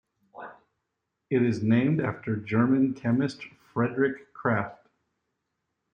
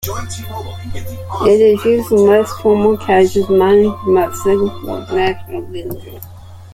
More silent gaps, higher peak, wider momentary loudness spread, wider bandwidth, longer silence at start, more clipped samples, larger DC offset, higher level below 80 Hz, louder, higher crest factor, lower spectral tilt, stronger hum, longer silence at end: neither; second, -10 dBFS vs -2 dBFS; about the same, 19 LU vs 17 LU; second, 8.8 kHz vs 16 kHz; first, 0.35 s vs 0 s; neither; neither; second, -68 dBFS vs -40 dBFS; second, -27 LUFS vs -13 LUFS; about the same, 18 dB vs 14 dB; first, -8.5 dB/octave vs -6 dB/octave; neither; first, 1.2 s vs 0 s